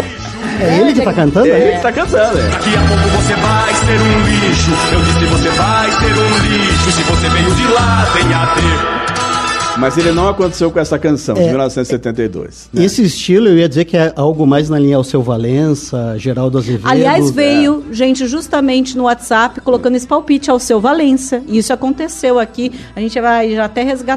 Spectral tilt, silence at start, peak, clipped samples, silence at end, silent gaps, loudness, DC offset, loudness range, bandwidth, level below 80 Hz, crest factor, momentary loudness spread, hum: -5 dB/octave; 0 s; 0 dBFS; under 0.1%; 0 s; none; -12 LUFS; under 0.1%; 3 LU; 13 kHz; -26 dBFS; 12 dB; 6 LU; none